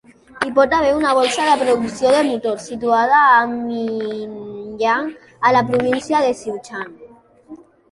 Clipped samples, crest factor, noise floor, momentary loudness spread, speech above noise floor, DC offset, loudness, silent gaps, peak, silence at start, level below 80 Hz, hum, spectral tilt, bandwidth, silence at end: under 0.1%; 16 dB; -44 dBFS; 15 LU; 28 dB; under 0.1%; -17 LUFS; none; -2 dBFS; 0.35 s; -52 dBFS; none; -4 dB/octave; 11.5 kHz; 0.35 s